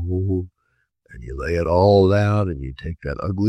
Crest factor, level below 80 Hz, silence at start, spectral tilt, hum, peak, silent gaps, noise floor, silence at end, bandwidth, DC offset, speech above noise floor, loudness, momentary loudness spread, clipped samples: 16 dB; -38 dBFS; 0 s; -8.5 dB/octave; none; -4 dBFS; none; -69 dBFS; 0 s; 8.6 kHz; under 0.1%; 50 dB; -20 LUFS; 18 LU; under 0.1%